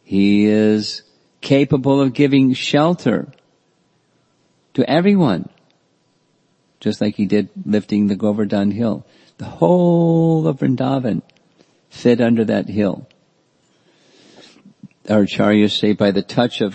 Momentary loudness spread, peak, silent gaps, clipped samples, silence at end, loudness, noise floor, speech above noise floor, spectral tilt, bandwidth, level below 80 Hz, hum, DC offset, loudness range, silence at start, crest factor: 12 LU; 0 dBFS; none; under 0.1%; 0 s; -17 LUFS; -61 dBFS; 46 dB; -7 dB/octave; 8.6 kHz; -58 dBFS; none; under 0.1%; 4 LU; 0.1 s; 18 dB